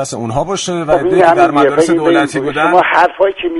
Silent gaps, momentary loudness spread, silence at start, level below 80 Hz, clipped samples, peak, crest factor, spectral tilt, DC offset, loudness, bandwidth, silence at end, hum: none; 8 LU; 0 s; -42 dBFS; under 0.1%; 0 dBFS; 12 dB; -5 dB/octave; under 0.1%; -11 LUFS; 11.5 kHz; 0 s; none